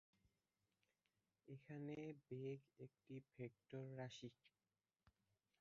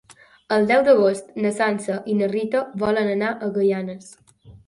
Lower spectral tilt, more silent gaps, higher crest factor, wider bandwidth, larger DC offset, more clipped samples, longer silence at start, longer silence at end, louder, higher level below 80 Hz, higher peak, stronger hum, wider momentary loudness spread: about the same, -6.5 dB/octave vs -6 dB/octave; neither; about the same, 20 dB vs 16 dB; second, 7 kHz vs 11.5 kHz; neither; neither; first, 0.25 s vs 0.1 s; first, 0.5 s vs 0.15 s; second, -56 LUFS vs -21 LUFS; second, -90 dBFS vs -60 dBFS; second, -38 dBFS vs -4 dBFS; neither; about the same, 10 LU vs 9 LU